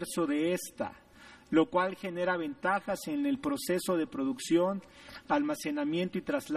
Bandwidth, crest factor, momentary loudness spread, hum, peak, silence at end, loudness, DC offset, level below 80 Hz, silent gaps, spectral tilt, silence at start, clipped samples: 15 kHz; 18 dB; 7 LU; none; -12 dBFS; 0 s; -32 LUFS; under 0.1%; -66 dBFS; none; -5 dB/octave; 0 s; under 0.1%